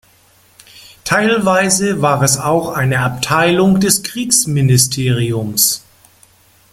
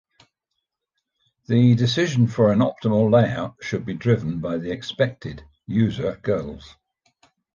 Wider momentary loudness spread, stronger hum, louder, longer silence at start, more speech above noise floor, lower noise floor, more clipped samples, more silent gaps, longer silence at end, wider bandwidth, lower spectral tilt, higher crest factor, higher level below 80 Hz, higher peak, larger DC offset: second, 5 LU vs 12 LU; neither; first, -13 LUFS vs -21 LUFS; second, 0.75 s vs 1.5 s; second, 37 dB vs 59 dB; second, -50 dBFS vs -80 dBFS; neither; neither; about the same, 0.95 s vs 0.85 s; first, 16.5 kHz vs 7.4 kHz; second, -4 dB/octave vs -7.5 dB/octave; about the same, 16 dB vs 18 dB; first, -46 dBFS vs -52 dBFS; first, 0 dBFS vs -4 dBFS; neither